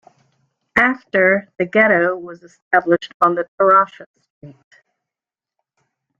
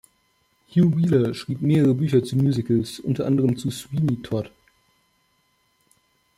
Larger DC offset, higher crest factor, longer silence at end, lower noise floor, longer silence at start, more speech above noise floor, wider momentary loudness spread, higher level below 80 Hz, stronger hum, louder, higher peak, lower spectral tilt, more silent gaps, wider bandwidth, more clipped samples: neither; about the same, 18 dB vs 16 dB; second, 1.7 s vs 1.9 s; first, -89 dBFS vs -67 dBFS; about the same, 0.75 s vs 0.75 s; first, 72 dB vs 46 dB; about the same, 7 LU vs 9 LU; about the same, -60 dBFS vs -58 dBFS; neither; first, -16 LUFS vs -22 LUFS; first, -2 dBFS vs -6 dBFS; second, -6.5 dB/octave vs -8 dB/octave; first, 2.62-2.71 s, 3.14-3.20 s, 3.48-3.58 s, 4.06-4.14 s, 4.30-4.41 s vs none; second, 7.4 kHz vs 15 kHz; neither